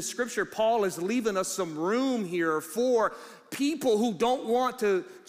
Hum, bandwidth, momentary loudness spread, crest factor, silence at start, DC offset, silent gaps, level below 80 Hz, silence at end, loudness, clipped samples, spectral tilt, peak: none; 15.5 kHz; 5 LU; 14 dB; 0 s; under 0.1%; none; -68 dBFS; 0.1 s; -28 LUFS; under 0.1%; -4 dB/octave; -14 dBFS